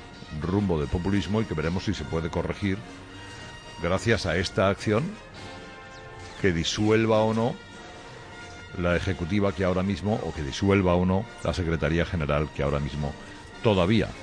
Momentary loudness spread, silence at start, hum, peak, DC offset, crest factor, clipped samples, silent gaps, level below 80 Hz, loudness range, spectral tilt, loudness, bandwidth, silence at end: 19 LU; 0 s; none; -8 dBFS; under 0.1%; 18 dB; under 0.1%; none; -42 dBFS; 3 LU; -6 dB/octave; -26 LUFS; 10.5 kHz; 0 s